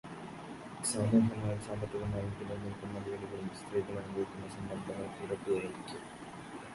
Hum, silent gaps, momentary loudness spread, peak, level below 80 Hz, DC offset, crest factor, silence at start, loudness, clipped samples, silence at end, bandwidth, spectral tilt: none; none; 16 LU; -16 dBFS; -58 dBFS; under 0.1%; 22 dB; 0.05 s; -37 LUFS; under 0.1%; 0 s; 11.5 kHz; -6 dB/octave